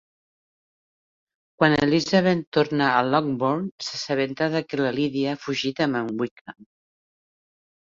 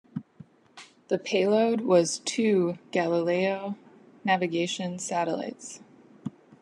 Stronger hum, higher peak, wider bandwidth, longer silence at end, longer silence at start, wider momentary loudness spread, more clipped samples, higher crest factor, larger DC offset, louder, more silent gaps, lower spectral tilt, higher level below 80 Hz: neither; first, -2 dBFS vs -10 dBFS; second, 7.6 kHz vs 11.5 kHz; first, 1.4 s vs 0.3 s; first, 1.6 s vs 0.15 s; second, 8 LU vs 18 LU; neither; about the same, 22 dB vs 18 dB; neither; first, -23 LUFS vs -27 LUFS; first, 2.47-2.52 s, 3.71-3.78 s, 6.31-6.45 s vs none; about the same, -5.5 dB/octave vs -4.5 dB/octave; first, -60 dBFS vs -78 dBFS